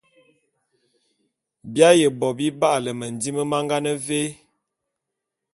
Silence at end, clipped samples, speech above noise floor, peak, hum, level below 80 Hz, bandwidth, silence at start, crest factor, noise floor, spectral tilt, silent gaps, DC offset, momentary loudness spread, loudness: 1.2 s; under 0.1%; 62 dB; -2 dBFS; none; -66 dBFS; 12 kHz; 1.65 s; 22 dB; -83 dBFS; -4.5 dB/octave; none; under 0.1%; 13 LU; -21 LUFS